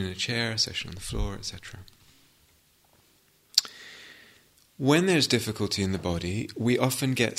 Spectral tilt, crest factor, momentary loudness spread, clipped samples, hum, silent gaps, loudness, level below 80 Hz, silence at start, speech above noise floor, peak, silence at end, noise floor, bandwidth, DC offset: -4 dB/octave; 28 dB; 22 LU; under 0.1%; none; none; -27 LUFS; -46 dBFS; 0 s; 36 dB; 0 dBFS; 0 s; -63 dBFS; 16 kHz; under 0.1%